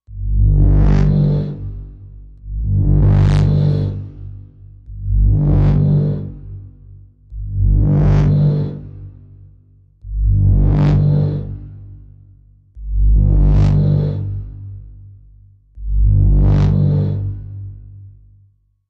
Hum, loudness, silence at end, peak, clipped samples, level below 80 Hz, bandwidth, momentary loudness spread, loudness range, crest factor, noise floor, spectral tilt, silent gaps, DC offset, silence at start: 50 Hz at -25 dBFS; -15 LUFS; 0.8 s; -2 dBFS; under 0.1%; -20 dBFS; 5.2 kHz; 21 LU; 2 LU; 12 dB; -54 dBFS; -10 dB/octave; none; under 0.1%; 0.1 s